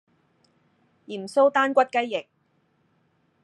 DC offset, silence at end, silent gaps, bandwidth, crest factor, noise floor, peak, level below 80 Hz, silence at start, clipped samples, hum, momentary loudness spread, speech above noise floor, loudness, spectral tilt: under 0.1%; 1.2 s; none; 11 kHz; 20 dB; -68 dBFS; -6 dBFS; -88 dBFS; 1.1 s; under 0.1%; none; 16 LU; 45 dB; -23 LUFS; -4 dB/octave